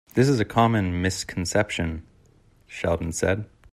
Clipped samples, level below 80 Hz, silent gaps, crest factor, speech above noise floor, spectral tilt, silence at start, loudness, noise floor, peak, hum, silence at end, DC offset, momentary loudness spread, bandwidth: under 0.1%; -48 dBFS; none; 18 dB; 34 dB; -5.5 dB/octave; 0.15 s; -24 LUFS; -57 dBFS; -6 dBFS; none; 0.25 s; under 0.1%; 10 LU; 14.5 kHz